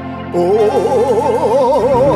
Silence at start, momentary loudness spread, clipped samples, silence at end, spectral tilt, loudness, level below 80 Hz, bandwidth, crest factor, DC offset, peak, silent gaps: 0 s; 3 LU; under 0.1%; 0 s; -7 dB/octave; -13 LUFS; -40 dBFS; 12.5 kHz; 12 dB; under 0.1%; 0 dBFS; none